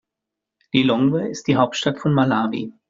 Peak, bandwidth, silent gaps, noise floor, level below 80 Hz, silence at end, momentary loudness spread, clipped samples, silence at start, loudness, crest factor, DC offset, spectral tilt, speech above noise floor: -2 dBFS; 7.6 kHz; none; -84 dBFS; -58 dBFS; 0.2 s; 5 LU; under 0.1%; 0.75 s; -20 LUFS; 18 dB; under 0.1%; -5 dB/octave; 65 dB